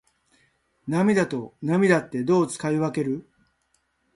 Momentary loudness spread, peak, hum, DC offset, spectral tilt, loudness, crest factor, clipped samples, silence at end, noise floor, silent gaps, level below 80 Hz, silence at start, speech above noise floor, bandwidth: 10 LU; -6 dBFS; none; under 0.1%; -6.5 dB/octave; -24 LUFS; 20 dB; under 0.1%; 0.95 s; -70 dBFS; none; -64 dBFS; 0.85 s; 48 dB; 11.5 kHz